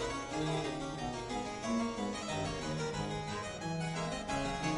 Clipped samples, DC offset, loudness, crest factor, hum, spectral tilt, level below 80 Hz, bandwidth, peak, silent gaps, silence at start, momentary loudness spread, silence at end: under 0.1%; under 0.1%; -37 LUFS; 16 dB; none; -4.5 dB/octave; -54 dBFS; 11.5 kHz; -22 dBFS; none; 0 s; 4 LU; 0 s